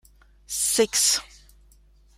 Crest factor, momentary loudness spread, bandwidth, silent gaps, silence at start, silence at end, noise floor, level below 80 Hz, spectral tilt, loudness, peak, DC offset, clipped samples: 20 dB; 8 LU; 16 kHz; none; 0.5 s; 0.95 s; -56 dBFS; -54 dBFS; 0 dB/octave; -21 LUFS; -8 dBFS; under 0.1%; under 0.1%